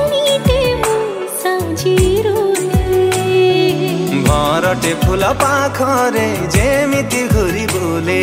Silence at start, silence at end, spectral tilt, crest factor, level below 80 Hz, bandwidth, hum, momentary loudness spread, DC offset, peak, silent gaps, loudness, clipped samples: 0 s; 0 s; -5 dB/octave; 14 dB; -26 dBFS; 16.5 kHz; none; 4 LU; under 0.1%; 0 dBFS; none; -14 LUFS; under 0.1%